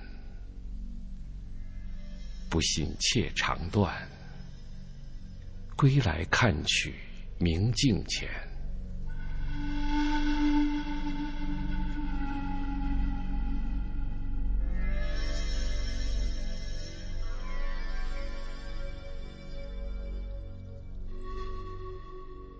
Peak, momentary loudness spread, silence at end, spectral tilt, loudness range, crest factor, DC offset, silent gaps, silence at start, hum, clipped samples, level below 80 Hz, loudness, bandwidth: -12 dBFS; 18 LU; 0 s; -4.5 dB/octave; 13 LU; 20 dB; under 0.1%; none; 0 s; none; under 0.1%; -34 dBFS; -32 LUFS; 8 kHz